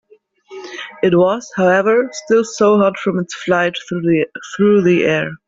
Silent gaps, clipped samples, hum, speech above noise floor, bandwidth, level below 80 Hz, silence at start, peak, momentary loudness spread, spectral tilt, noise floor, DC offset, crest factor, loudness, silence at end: none; under 0.1%; none; 32 dB; 7.8 kHz; -56 dBFS; 0.5 s; -2 dBFS; 10 LU; -6 dB/octave; -46 dBFS; under 0.1%; 14 dB; -15 LUFS; 0.1 s